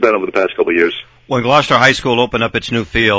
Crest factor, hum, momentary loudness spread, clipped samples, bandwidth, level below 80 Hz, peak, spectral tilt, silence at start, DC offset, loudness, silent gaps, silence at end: 14 dB; none; 8 LU; under 0.1%; 8 kHz; -40 dBFS; 0 dBFS; -5 dB/octave; 0 s; under 0.1%; -13 LUFS; none; 0 s